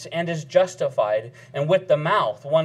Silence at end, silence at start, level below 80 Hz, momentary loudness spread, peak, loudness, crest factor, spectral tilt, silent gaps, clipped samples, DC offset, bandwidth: 0 s; 0 s; -72 dBFS; 7 LU; -4 dBFS; -22 LUFS; 18 dB; -5.5 dB/octave; none; under 0.1%; under 0.1%; 11 kHz